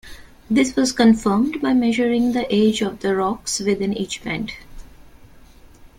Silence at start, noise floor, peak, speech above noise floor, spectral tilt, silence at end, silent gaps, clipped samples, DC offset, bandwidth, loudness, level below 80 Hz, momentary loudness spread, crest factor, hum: 0.05 s; -45 dBFS; -2 dBFS; 27 dB; -4.5 dB/octave; 0.1 s; none; under 0.1%; under 0.1%; 15.5 kHz; -19 LUFS; -46 dBFS; 10 LU; 18 dB; none